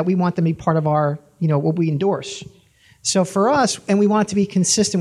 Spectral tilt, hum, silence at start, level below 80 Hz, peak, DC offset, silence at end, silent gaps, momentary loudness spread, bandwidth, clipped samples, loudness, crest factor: -5 dB/octave; none; 0 s; -56 dBFS; -4 dBFS; under 0.1%; 0 s; none; 7 LU; 13 kHz; under 0.1%; -19 LUFS; 16 dB